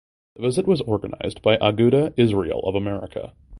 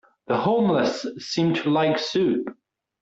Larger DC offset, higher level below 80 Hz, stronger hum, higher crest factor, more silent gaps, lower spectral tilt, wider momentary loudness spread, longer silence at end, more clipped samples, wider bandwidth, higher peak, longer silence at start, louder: neither; first, -46 dBFS vs -66 dBFS; neither; first, 20 dB vs 14 dB; neither; about the same, -7 dB/octave vs -6 dB/octave; first, 12 LU vs 8 LU; second, 0 s vs 0.5 s; neither; first, 11.5 kHz vs 8 kHz; first, 0 dBFS vs -10 dBFS; about the same, 0.4 s vs 0.3 s; about the same, -21 LUFS vs -23 LUFS